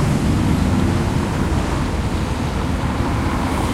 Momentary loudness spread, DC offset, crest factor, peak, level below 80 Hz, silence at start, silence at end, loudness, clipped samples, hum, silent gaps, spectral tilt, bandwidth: 4 LU; under 0.1%; 14 dB; -4 dBFS; -26 dBFS; 0 s; 0 s; -20 LUFS; under 0.1%; none; none; -6.5 dB/octave; 15.5 kHz